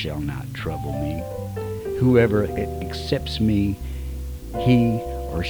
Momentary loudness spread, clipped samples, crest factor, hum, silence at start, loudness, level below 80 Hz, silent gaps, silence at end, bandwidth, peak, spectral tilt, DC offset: 13 LU; under 0.1%; 18 dB; none; 0 s; -23 LUFS; -34 dBFS; none; 0 s; over 20 kHz; -6 dBFS; -7.5 dB/octave; under 0.1%